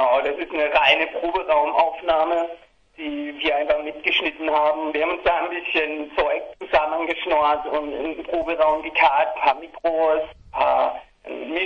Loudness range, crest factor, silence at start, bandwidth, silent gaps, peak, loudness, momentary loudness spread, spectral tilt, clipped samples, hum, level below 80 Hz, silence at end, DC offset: 2 LU; 18 dB; 0 s; 6.6 kHz; none; -2 dBFS; -21 LUFS; 10 LU; -4.5 dB/octave; under 0.1%; none; -52 dBFS; 0 s; under 0.1%